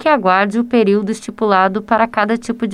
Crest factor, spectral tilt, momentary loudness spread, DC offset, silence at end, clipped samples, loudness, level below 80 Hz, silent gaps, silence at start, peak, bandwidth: 14 dB; -6 dB/octave; 6 LU; under 0.1%; 0 s; under 0.1%; -15 LUFS; -54 dBFS; none; 0 s; 0 dBFS; 11.5 kHz